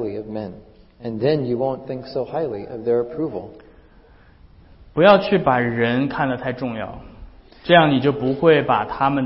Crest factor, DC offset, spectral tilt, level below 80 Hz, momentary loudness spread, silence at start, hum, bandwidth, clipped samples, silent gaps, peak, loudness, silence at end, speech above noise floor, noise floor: 20 dB; under 0.1%; -11 dB/octave; -48 dBFS; 17 LU; 0 s; none; 5.8 kHz; under 0.1%; none; -2 dBFS; -19 LUFS; 0 s; 30 dB; -49 dBFS